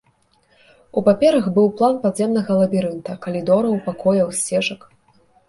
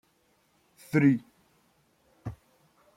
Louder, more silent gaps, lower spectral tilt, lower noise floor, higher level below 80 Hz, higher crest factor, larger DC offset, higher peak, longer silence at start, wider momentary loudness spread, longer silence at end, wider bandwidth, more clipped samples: first, -19 LUFS vs -26 LUFS; neither; second, -5.5 dB/octave vs -8.5 dB/octave; second, -60 dBFS vs -69 dBFS; first, -58 dBFS vs -64 dBFS; about the same, 16 dB vs 20 dB; neither; first, -2 dBFS vs -12 dBFS; about the same, 0.95 s vs 0.95 s; second, 10 LU vs 20 LU; first, 0.75 s vs 0.6 s; second, 11.5 kHz vs 14.5 kHz; neither